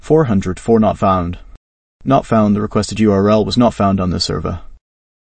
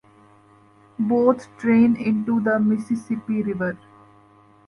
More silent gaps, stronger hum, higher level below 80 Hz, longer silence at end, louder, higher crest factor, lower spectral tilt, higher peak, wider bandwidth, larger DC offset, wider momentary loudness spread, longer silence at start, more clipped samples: first, 1.57-1.99 s vs none; neither; first, -36 dBFS vs -62 dBFS; second, 0.45 s vs 0.9 s; first, -15 LUFS vs -21 LUFS; about the same, 14 dB vs 18 dB; second, -6.5 dB/octave vs -8.5 dB/octave; first, 0 dBFS vs -4 dBFS; second, 8.8 kHz vs 10.5 kHz; neither; about the same, 12 LU vs 10 LU; second, 0 s vs 1 s; neither